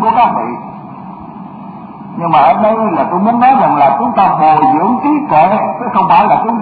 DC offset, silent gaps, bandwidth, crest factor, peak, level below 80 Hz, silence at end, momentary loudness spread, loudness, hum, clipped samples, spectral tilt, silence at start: under 0.1%; none; 4.9 kHz; 10 dB; 0 dBFS; -48 dBFS; 0 s; 20 LU; -10 LUFS; none; under 0.1%; -10 dB/octave; 0 s